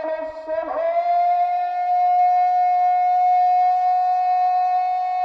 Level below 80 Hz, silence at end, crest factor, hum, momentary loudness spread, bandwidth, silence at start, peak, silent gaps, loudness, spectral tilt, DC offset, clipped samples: -66 dBFS; 0 s; 8 dB; none; 7 LU; 6 kHz; 0 s; -12 dBFS; none; -19 LUFS; -3.5 dB/octave; under 0.1%; under 0.1%